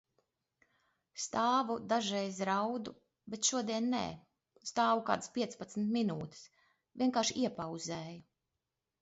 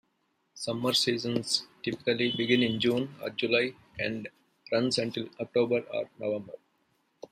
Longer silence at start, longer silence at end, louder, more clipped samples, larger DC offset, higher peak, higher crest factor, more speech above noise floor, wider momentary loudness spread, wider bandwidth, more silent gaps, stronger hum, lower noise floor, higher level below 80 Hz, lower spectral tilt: first, 1.15 s vs 0.55 s; about the same, 0.8 s vs 0.75 s; second, -35 LUFS vs -29 LUFS; neither; neither; second, -16 dBFS vs -10 dBFS; about the same, 22 dB vs 20 dB; first, 54 dB vs 45 dB; first, 16 LU vs 11 LU; second, 8 kHz vs 15.5 kHz; neither; neither; first, -89 dBFS vs -75 dBFS; about the same, -74 dBFS vs -70 dBFS; about the same, -3.5 dB/octave vs -4 dB/octave